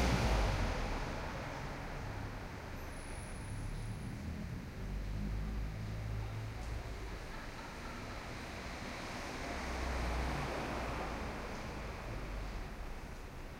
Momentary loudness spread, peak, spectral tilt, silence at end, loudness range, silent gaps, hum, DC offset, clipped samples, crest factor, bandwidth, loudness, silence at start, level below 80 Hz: 8 LU; -20 dBFS; -5.5 dB/octave; 0 s; 4 LU; none; none; under 0.1%; under 0.1%; 20 dB; 16 kHz; -42 LUFS; 0 s; -44 dBFS